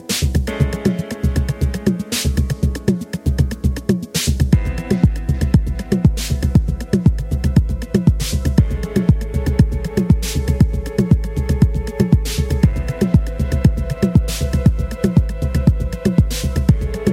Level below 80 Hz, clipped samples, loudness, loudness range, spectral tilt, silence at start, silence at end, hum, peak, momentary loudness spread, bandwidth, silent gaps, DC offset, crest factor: -22 dBFS; under 0.1%; -18 LUFS; 2 LU; -6.5 dB/octave; 0 s; 0 s; none; 0 dBFS; 4 LU; 16.5 kHz; none; under 0.1%; 16 dB